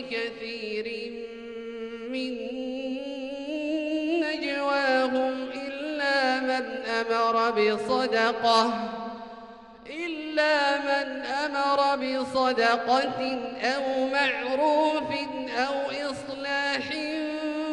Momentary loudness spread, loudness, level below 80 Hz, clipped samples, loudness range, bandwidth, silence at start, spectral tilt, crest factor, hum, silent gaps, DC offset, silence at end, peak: 12 LU; -27 LUFS; -66 dBFS; under 0.1%; 6 LU; 11.5 kHz; 0 s; -3.5 dB/octave; 18 dB; none; none; under 0.1%; 0 s; -10 dBFS